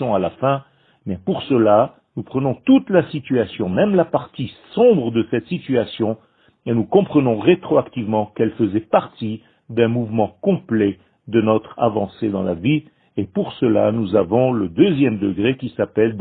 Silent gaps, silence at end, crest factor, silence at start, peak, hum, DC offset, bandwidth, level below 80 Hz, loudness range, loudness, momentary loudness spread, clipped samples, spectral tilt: none; 0 s; 18 dB; 0 s; 0 dBFS; none; under 0.1%; 4.5 kHz; -54 dBFS; 2 LU; -19 LUFS; 11 LU; under 0.1%; -12 dB/octave